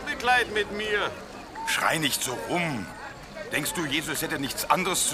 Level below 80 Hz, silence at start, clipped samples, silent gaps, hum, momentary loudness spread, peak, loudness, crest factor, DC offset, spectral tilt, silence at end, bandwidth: -52 dBFS; 0 s; under 0.1%; none; none; 16 LU; -6 dBFS; -26 LUFS; 22 dB; under 0.1%; -2.5 dB/octave; 0 s; 15.5 kHz